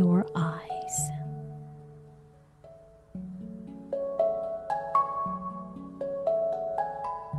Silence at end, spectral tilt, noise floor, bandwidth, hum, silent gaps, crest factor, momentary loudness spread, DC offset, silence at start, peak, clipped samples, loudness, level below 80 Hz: 0 s; -6.5 dB/octave; -55 dBFS; 12.5 kHz; none; none; 18 dB; 18 LU; under 0.1%; 0 s; -14 dBFS; under 0.1%; -31 LUFS; -60 dBFS